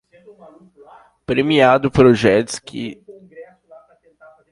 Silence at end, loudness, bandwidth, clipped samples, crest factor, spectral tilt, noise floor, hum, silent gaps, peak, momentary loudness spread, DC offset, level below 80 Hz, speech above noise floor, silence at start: 1.1 s; -15 LUFS; 11.5 kHz; under 0.1%; 18 dB; -6 dB/octave; -49 dBFS; none; none; 0 dBFS; 17 LU; under 0.1%; -48 dBFS; 33 dB; 1.3 s